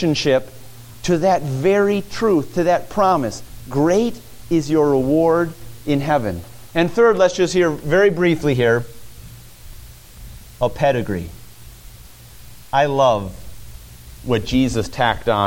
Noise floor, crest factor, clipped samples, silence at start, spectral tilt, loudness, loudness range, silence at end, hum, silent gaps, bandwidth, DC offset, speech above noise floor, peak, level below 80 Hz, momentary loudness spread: -41 dBFS; 16 dB; under 0.1%; 0 s; -6 dB/octave; -18 LUFS; 6 LU; 0 s; none; none; 17 kHz; under 0.1%; 24 dB; -2 dBFS; -40 dBFS; 12 LU